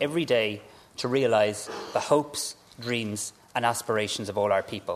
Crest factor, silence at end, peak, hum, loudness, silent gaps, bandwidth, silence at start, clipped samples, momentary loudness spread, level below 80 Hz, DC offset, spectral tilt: 18 dB; 0 s; -8 dBFS; none; -27 LUFS; none; 14 kHz; 0 s; under 0.1%; 11 LU; -68 dBFS; under 0.1%; -4 dB/octave